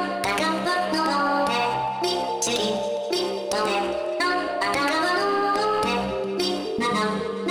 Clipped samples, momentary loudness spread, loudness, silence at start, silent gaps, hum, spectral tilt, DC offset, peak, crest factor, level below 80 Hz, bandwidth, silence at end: under 0.1%; 4 LU; -24 LUFS; 0 s; none; none; -3 dB/octave; under 0.1%; -10 dBFS; 14 dB; -54 dBFS; over 20 kHz; 0 s